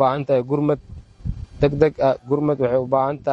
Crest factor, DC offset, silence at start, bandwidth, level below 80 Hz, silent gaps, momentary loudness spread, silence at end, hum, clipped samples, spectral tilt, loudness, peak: 18 dB; under 0.1%; 0 s; 7.4 kHz; -40 dBFS; none; 14 LU; 0 s; none; under 0.1%; -9 dB/octave; -20 LUFS; -2 dBFS